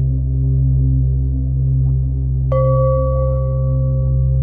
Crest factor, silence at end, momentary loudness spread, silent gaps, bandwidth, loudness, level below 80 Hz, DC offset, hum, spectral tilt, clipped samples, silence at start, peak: 10 dB; 0 s; 3 LU; none; 2.1 kHz; -17 LUFS; -20 dBFS; under 0.1%; none; -14.5 dB/octave; under 0.1%; 0 s; -4 dBFS